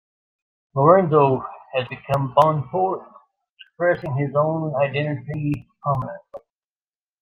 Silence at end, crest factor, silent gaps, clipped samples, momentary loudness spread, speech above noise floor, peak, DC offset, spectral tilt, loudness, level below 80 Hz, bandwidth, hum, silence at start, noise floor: 0.85 s; 20 dB; 3.50-3.57 s; under 0.1%; 12 LU; over 70 dB; -2 dBFS; under 0.1%; -8.5 dB/octave; -21 LUFS; -56 dBFS; 8.4 kHz; none; 0.75 s; under -90 dBFS